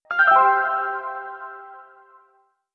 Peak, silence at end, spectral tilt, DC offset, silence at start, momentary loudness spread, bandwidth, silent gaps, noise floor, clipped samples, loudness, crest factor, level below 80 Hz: -4 dBFS; 0.95 s; -4 dB/octave; under 0.1%; 0.1 s; 22 LU; 5.8 kHz; none; -63 dBFS; under 0.1%; -18 LUFS; 18 dB; -82 dBFS